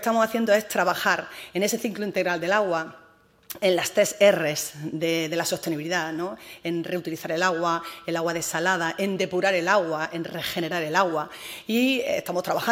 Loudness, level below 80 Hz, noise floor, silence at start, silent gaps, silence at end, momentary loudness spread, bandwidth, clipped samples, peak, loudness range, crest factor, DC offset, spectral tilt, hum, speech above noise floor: -25 LUFS; -68 dBFS; -48 dBFS; 0 s; none; 0 s; 9 LU; 16 kHz; under 0.1%; -4 dBFS; 3 LU; 20 dB; under 0.1%; -3.5 dB/octave; none; 23 dB